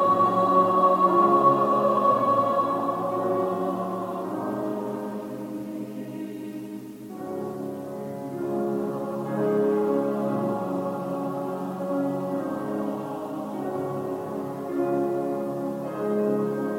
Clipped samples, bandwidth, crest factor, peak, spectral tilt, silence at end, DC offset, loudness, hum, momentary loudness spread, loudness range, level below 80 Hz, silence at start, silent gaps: under 0.1%; 16 kHz; 18 dB; -8 dBFS; -8 dB/octave; 0 s; under 0.1%; -26 LUFS; none; 14 LU; 12 LU; -70 dBFS; 0 s; none